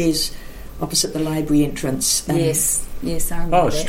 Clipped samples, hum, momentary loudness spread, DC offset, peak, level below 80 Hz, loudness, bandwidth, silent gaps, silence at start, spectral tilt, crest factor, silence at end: under 0.1%; none; 9 LU; under 0.1%; -4 dBFS; -30 dBFS; -19 LUFS; 16.5 kHz; none; 0 s; -3.5 dB/octave; 14 dB; 0 s